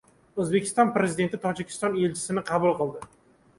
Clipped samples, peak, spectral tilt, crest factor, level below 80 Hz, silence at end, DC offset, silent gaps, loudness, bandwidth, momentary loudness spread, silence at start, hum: under 0.1%; -8 dBFS; -5.5 dB/octave; 20 dB; -62 dBFS; 0.5 s; under 0.1%; none; -26 LUFS; 11.5 kHz; 9 LU; 0.35 s; none